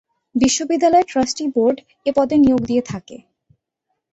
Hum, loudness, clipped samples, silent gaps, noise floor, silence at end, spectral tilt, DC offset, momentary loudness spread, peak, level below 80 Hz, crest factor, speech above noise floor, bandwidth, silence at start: none; -17 LUFS; under 0.1%; none; -76 dBFS; 0.95 s; -4.5 dB/octave; under 0.1%; 10 LU; -4 dBFS; -48 dBFS; 16 dB; 59 dB; 8.2 kHz; 0.35 s